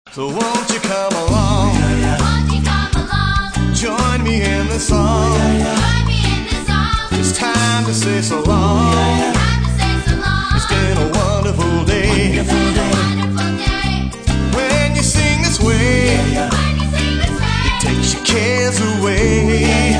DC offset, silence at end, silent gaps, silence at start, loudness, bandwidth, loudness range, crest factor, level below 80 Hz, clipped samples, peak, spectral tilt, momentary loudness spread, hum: under 0.1%; 0 s; none; 0.05 s; -15 LUFS; 10.5 kHz; 1 LU; 14 dB; -22 dBFS; under 0.1%; 0 dBFS; -4.5 dB/octave; 4 LU; none